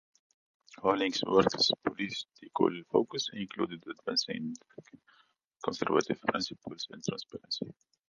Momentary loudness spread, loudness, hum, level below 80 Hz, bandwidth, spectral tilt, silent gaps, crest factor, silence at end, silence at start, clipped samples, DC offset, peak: 13 LU; -32 LUFS; none; -70 dBFS; 10 kHz; -4 dB/octave; 5.47-5.51 s; 24 dB; 0.4 s; 0.7 s; under 0.1%; under 0.1%; -10 dBFS